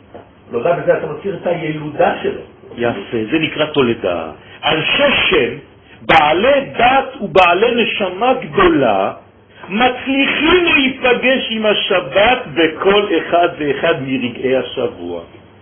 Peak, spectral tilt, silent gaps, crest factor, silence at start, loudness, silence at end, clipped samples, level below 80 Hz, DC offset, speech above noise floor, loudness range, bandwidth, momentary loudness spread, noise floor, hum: 0 dBFS; -7 dB/octave; none; 16 dB; 0.15 s; -14 LUFS; 0.35 s; under 0.1%; -42 dBFS; under 0.1%; 24 dB; 5 LU; 8 kHz; 11 LU; -39 dBFS; none